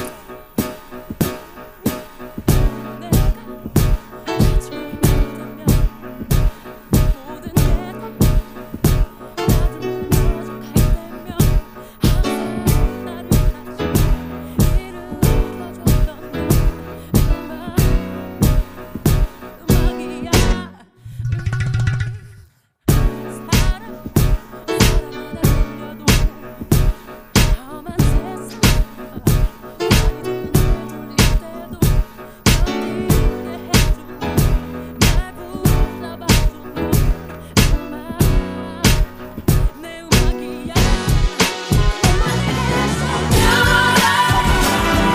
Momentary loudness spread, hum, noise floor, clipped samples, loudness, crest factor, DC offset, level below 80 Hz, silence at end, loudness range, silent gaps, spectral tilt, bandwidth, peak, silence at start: 11 LU; none; -48 dBFS; under 0.1%; -19 LUFS; 18 dB; under 0.1%; -20 dBFS; 0 s; 3 LU; none; -5 dB/octave; 15.5 kHz; 0 dBFS; 0 s